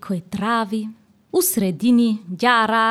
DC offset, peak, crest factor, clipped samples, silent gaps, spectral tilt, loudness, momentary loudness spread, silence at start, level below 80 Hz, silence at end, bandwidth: under 0.1%; -2 dBFS; 16 dB; under 0.1%; none; -4 dB/octave; -19 LUFS; 10 LU; 0.05 s; -62 dBFS; 0 s; 16.5 kHz